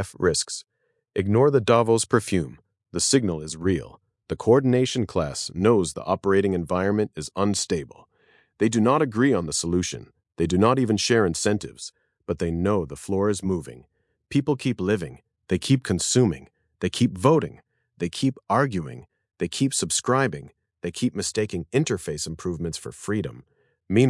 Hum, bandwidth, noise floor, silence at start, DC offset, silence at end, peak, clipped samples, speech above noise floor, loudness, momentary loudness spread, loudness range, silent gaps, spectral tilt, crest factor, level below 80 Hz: none; 12 kHz; -62 dBFS; 0 s; under 0.1%; 0 s; -4 dBFS; under 0.1%; 38 dB; -24 LUFS; 13 LU; 4 LU; none; -5 dB/octave; 20 dB; -54 dBFS